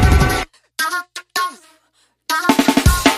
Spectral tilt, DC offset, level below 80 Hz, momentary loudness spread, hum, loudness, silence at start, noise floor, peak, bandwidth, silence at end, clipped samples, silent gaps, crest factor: -4.5 dB/octave; under 0.1%; -22 dBFS; 11 LU; none; -17 LUFS; 0 s; -61 dBFS; 0 dBFS; 15.5 kHz; 0 s; under 0.1%; none; 16 dB